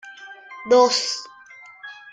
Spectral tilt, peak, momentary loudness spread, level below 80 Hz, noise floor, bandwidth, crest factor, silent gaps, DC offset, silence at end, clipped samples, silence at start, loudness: -1 dB/octave; -4 dBFS; 24 LU; -72 dBFS; -45 dBFS; 9.4 kHz; 20 dB; none; under 0.1%; 0.2 s; under 0.1%; 0.05 s; -19 LUFS